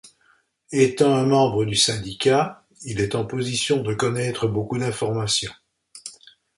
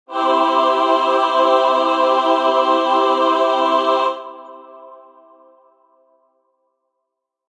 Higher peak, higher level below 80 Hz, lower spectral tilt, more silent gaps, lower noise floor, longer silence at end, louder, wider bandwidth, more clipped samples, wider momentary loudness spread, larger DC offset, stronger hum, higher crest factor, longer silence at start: about the same, -4 dBFS vs -2 dBFS; first, -52 dBFS vs -76 dBFS; first, -4.5 dB/octave vs -2 dB/octave; neither; second, -62 dBFS vs -77 dBFS; second, 0.45 s vs 2.6 s; second, -22 LUFS vs -15 LUFS; first, 11.5 kHz vs 10 kHz; neither; first, 15 LU vs 4 LU; neither; neither; about the same, 18 dB vs 16 dB; about the same, 0.05 s vs 0.1 s